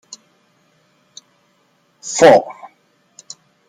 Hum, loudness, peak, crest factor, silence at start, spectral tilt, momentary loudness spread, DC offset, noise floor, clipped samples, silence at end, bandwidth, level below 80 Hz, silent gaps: none; -12 LUFS; 0 dBFS; 18 dB; 2.05 s; -3.5 dB/octave; 29 LU; under 0.1%; -60 dBFS; under 0.1%; 1.15 s; 12 kHz; -60 dBFS; none